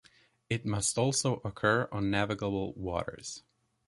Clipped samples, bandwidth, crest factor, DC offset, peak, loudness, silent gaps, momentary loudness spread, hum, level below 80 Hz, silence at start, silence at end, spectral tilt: under 0.1%; 11.5 kHz; 20 dB; under 0.1%; -12 dBFS; -31 LUFS; none; 11 LU; none; -54 dBFS; 0.5 s; 0.5 s; -4 dB/octave